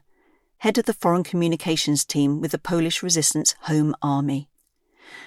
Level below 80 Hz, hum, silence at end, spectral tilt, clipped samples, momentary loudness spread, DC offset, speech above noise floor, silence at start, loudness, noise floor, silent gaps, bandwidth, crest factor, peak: -62 dBFS; none; 0 s; -4 dB/octave; under 0.1%; 5 LU; under 0.1%; 42 dB; 0.6 s; -22 LUFS; -64 dBFS; none; 16 kHz; 18 dB; -4 dBFS